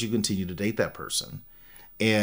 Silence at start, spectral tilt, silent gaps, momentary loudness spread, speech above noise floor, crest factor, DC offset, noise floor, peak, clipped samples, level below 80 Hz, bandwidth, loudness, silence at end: 0 s; -4 dB/octave; none; 21 LU; 18 dB; 20 dB; under 0.1%; -47 dBFS; -8 dBFS; under 0.1%; -56 dBFS; 16 kHz; -28 LUFS; 0 s